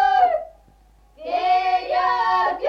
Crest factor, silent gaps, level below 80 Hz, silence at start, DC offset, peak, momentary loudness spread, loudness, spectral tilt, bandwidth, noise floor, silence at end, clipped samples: 14 dB; none; -54 dBFS; 0 s; under 0.1%; -8 dBFS; 11 LU; -20 LUFS; -3.5 dB/octave; 6.6 kHz; -53 dBFS; 0 s; under 0.1%